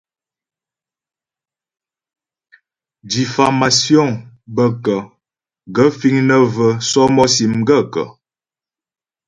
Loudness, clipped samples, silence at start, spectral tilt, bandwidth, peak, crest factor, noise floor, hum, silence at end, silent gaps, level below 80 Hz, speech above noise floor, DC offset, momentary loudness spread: -14 LUFS; under 0.1%; 3.05 s; -4.5 dB/octave; 11 kHz; 0 dBFS; 16 dB; under -90 dBFS; none; 1.15 s; none; -54 dBFS; over 76 dB; under 0.1%; 11 LU